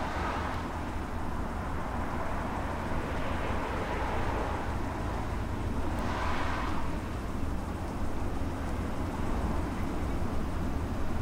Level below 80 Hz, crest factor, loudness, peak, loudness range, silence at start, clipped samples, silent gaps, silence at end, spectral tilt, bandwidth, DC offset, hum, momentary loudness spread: -38 dBFS; 14 dB; -34 LUFS; -18 dBFS; 1 LU; 0 s; under 0.1%; none; 0 s; -6.5 dB/octave; 15.5 kHz; under 0.1%; none; 4 LU